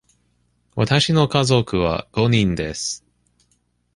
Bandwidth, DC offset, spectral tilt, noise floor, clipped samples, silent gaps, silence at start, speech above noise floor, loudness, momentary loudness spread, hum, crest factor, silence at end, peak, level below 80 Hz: 11.5 kHz; under 0.1%; -5 dB/octave; -65 dBFS; under 0.1%; none; 0.75 s; 47 dB; -19 LUFS; 10 LU; 60 Hz at -40 dBFS; 18 dB; 1 s; -2 dBFS; -42 dBFS